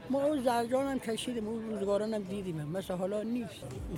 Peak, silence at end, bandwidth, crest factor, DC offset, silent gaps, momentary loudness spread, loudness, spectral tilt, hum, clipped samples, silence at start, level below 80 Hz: -16 dBFS; 0 s; 16.5 kHz; 18 dB; under 0.1%; none; 8 LU; -34 LUFS; -6 dB/octave; none; under 0.1%; 0 s; -56 dBFS